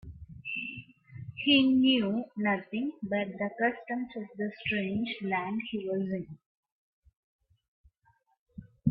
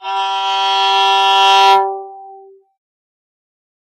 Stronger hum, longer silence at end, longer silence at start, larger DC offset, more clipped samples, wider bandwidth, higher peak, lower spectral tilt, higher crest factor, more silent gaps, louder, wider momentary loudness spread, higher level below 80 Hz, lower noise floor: neither; second, 0 s vs 1.45 s; about the same, 0.05 s vs 0 s; neither; neither; second, 5.2 kHz vs 15.5 kHz; second, -12 dBFS vs 0 dBFS; first, -9 dB/octave vs 1.5 dB/octave; first, 20 dB vs 14 dB; first, 6.46-6.63 s, 6.72-7.02 s, 7.17-7.39 s, 7.68-7.84 s, 8.38-8.46 s vs none; second, -30 LUFS vs -12 LUFS; first, 18 LU vs 13 LU; first, -64 dBFS vs under -90 dBFS; first, -71 dBFS vs -40 dBFS